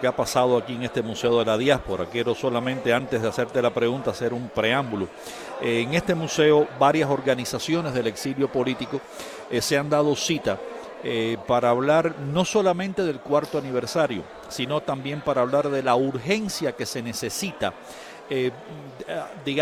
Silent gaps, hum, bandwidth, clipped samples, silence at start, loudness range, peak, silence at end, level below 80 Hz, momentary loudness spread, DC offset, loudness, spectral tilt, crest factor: none; none; 16 kHz; under 0.1%; 0 s; 3 LU; -4 dBFS; 0 s; -54 dBFS; 11 LU; under 0.1%; -24 LUFS; -4.5 dB/octave; 20 dB